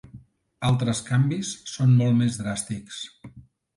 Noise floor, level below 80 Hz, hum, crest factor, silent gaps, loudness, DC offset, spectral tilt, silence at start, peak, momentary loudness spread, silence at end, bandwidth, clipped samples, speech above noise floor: -49 dBFS; -56 dBFS; none; 16 dB; none; -24 LUFS; under 0.1%; -6 dB/octave; 0.15 s; -10 dBFS; 15 LU; 0.35 s; 11.5 kHz; under 0.1%; 26 dB